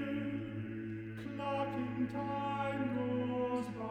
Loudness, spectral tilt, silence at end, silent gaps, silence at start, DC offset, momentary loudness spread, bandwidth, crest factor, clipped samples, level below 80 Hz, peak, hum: -38 LUFS; -8 dB/octave; 0 s; none; 0 s; under 0.1%; 7 LU; 9.6 kHz; 12 dB; under 0.1%; -66 dBFS; -24 dBFS; none